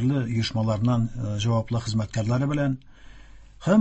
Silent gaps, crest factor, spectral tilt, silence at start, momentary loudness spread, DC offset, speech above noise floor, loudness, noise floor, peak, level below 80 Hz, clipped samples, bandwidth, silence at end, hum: none; 16 dB; -7 dB/octave; 0 s; 5 LU; under 0.1%; 22 dB; -26 LUFS; -46 dBFS; -8 dBFS; -46 dBFS; under 0.1%; 8.4 kHz; 0 s; none